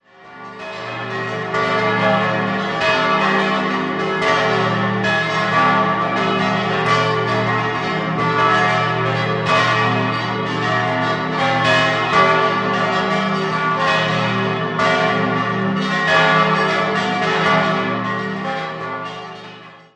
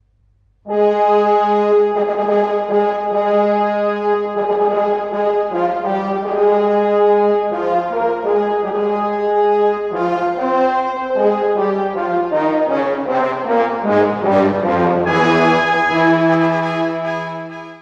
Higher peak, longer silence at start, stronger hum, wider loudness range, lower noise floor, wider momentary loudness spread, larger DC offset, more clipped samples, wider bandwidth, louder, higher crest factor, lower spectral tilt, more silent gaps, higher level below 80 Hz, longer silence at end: about the same, -2 dBFS vs -2 dBFS; second, 0.2 s vs 0.65 s; neither; about the same, 2 LU vs 3 LU; second, -39 dBFS vs -56 dBFS; first, 9 LU vs 6 LU; neither; neither; first, 9.8 kHz vs 7.2 kHz; about the same, -17 LUFS vs -16 LUFS; about the same, 16 dB vs 14 dB; second, -5.5 dB/octave vs -7 dB/octave; neither; about the same, -52 dBFS vs -54 dBFS; first, 0.2 s vs 0 s